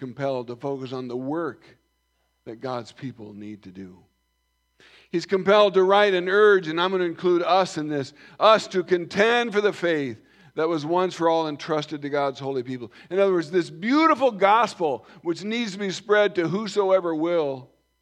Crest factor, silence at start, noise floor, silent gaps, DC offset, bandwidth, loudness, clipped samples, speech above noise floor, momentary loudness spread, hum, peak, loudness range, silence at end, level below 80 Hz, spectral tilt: 20 dB; 0 s; -72 dBFS; none; under 0.1%; 9.8 kHz; -23 LUFS; under 0.1%; 49 dB; 17 LU; none; -4 dBFS; 14 LU; 0.4 s; -72 dBFS; -5.5 dB/octave